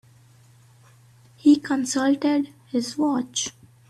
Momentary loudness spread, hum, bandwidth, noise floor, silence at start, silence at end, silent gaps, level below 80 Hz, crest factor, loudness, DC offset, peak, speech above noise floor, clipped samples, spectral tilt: 9 LU; none; 12.5 kHz; -53 dBFS; 1.45 s; 0.4 s; none; -68 dBFS; 18 dB; -23 LUFS; under 0.1%; -6 dBFS; 32 dB; under 0.1%; -3 dB/octave